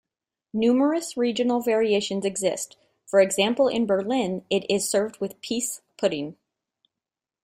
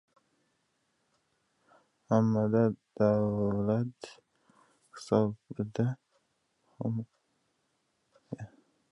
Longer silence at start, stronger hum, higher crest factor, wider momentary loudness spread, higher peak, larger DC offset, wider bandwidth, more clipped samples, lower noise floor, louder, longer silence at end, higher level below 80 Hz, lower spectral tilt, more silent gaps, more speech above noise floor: second, 0.55 s vs 2.1 s; neither; about the same, 18 dB vs 22 dB; second, 10 LU vs 20 LU; first, -6 dBFS vs -12 dBFS; neither; first, 16 kHz vs 11 kHz; neither; first, -89 dBFS vs -77 dBFS; first, -24 LUFS vs -30 LUFS; first, 1.1 s vs 0.45 s; about the same, -66 dBFS vs -64 dBFS; second, -4 dB/octave vs -8.5 dB/octave; neither; first, 66 dB vs 48 dB